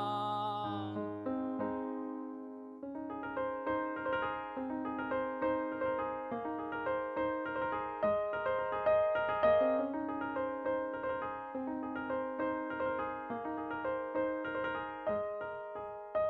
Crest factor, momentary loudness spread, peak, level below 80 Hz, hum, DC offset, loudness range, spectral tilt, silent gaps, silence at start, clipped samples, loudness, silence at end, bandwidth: 18 dB; 9 LU; -18 dBFS; -68 dBFS; none; under 0.1%; 6 LU; -8 dB/octave; none; 0 s; under 0.1%; -36 LUFS; 0 s; 5.2 kHz